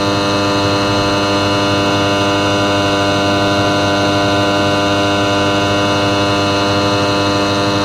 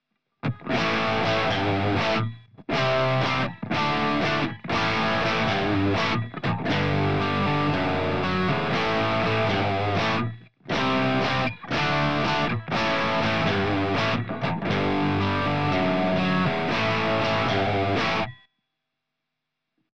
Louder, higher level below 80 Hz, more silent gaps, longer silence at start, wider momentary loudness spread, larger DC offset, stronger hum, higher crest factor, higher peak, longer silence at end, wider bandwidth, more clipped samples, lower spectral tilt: first, -13 LUFS vs -24 LUFS; first, -40 dBFS vs -50 dBFS; neither; about the same, 0 s vs 0 s; second, 1 LU vs 4 LU; second, 0.2% vs 0.9%; neither; about the same, 12 dB vs 12 dB; first, -2 dBFS vs -12 dBFS; about the same, 0 s vs 0.1 s; first, 15.5 kHz vs 9 kHz; neither; second, -4.5 dB/octave vs -6 dB/octave